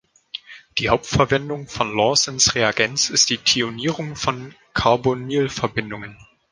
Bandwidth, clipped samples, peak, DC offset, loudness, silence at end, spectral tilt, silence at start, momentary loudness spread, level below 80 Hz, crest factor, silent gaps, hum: 11.5 kHz; under 0.1%; 0 dBFS; under 0.1%; -19 LUFS; 0.3 s; -3 dB/octave; 0.35 s; 17 LU; -44 dBFS; 20 dB; none; none